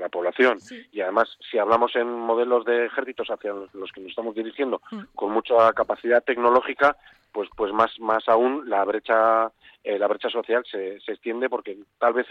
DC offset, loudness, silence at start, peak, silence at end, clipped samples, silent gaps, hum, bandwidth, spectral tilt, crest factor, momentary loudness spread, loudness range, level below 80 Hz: under 0.1%; -23 LUFS; 0 s; -6 dBFS; 0 s; under 0.1%; none; none; 7.8 kHz; -5.5 dB/octave; 16 dB; 13 LU; 4 LU; -64 dBFS